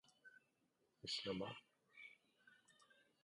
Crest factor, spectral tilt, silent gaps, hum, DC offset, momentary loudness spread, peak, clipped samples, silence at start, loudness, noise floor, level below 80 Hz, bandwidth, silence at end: 22 dB; -4 dB/octave; none; none; under 0.1%; 22 LU; -34 dBFS; under 0.1%; 0.25 s; -48 LUFS; -84 dBFS; -82 dBFS; 11 kHz; 0.3 s